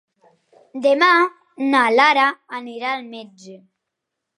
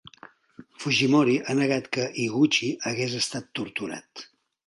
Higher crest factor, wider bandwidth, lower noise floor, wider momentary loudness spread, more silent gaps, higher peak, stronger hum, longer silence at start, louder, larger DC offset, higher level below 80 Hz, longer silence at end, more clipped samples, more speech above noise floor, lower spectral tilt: about the same, 18 dB vs 18 dB; about the same, 11.5 kHz vs 11.5 kHz; first, -80 dBFS vs -51 dBFS; first, 19 LU vs 14 LU; neither; first, -2 dBFS vs -10 dBFS; neither; first, 0.75 s vs 0.05 s; first, -17 LUFS vs -25 LUFS; neither; second, -82 dBFS vs -68 dBFS; first, 0.8 s vs 0.45 s; neither; first, 62 dB vs 26 dB; second, -3 dB/octave vs -4.5 dB/octave